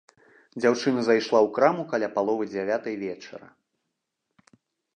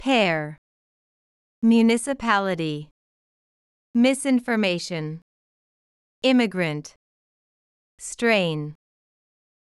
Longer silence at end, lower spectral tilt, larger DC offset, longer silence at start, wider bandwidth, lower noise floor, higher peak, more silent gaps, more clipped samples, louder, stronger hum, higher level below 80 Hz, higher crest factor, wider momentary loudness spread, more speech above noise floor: first, 1.55 s vs 1 s; about the same, -5.5 dB/octave vs -5 dB/octave; neither; first, 0.55 s vs 0 s; second, 9.6 kHz vs 12 kHz; second, -81 dBFS vs under -90 dBFS; about the same, -4 dBFS vs -6 dBFS; second, none vs 0.58-1.62 s, 2.91-3.94 s, 5.22-6.22 s, 6.96-7.98 s; neither; second, -25 LUFS vs -22 LUFS; neither; second, -76 dBFS vs -62 dBFS; about the same, 22 dB vs 18 dB; about the same, 18 LU vs 16 LU; second, 57 dB vs over 68 dB